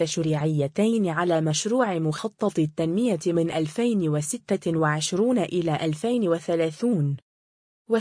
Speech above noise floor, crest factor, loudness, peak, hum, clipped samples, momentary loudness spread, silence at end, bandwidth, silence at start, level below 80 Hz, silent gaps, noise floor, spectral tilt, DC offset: over 66 dB; 14 dB; -24 LUFS; -10 dBFS; none; under 0.1%; 4 LU; 0 s; 10.5 kHz; 0 s; -64 dBFS; 7.22-7.85 s; under -90 dBFS; -5.5 dB/octave; under 0.1%